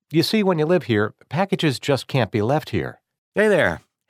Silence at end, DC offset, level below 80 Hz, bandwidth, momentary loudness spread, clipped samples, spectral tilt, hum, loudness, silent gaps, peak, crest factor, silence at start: 0.3 s; under 0.1%; -58 dBFS; 16.5 kHz; 8 LU; under 0.1%; -6 dB/octave; none; -21 LUFS; 3.18-3.32 s; -4 dBFS; 16 dB; 0.1 s